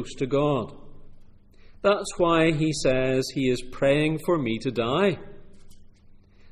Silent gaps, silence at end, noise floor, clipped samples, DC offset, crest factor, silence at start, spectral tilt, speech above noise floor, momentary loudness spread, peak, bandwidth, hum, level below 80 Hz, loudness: none; 0 s; -51 dBFS; under 0.1%; under 0.1%; 16 dB; 0 s; -5.5 dB/octave; 28 dB; 6 LU; -8 dBFS; 14 kHz; none; -44 dBFS; -24 LUFS